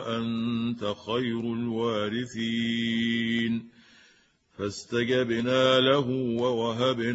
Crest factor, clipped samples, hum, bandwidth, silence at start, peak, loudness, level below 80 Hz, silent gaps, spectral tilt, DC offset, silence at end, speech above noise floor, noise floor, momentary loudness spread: 18 dB; under 0.1%; none; 8 kHz; 0 s; -8 dBFS; -27 LUFS; -64 dBFS; none; -5.5 dB/octave; under 0.1%; 0 s; 36 dB; -63 dBFS; 9 LU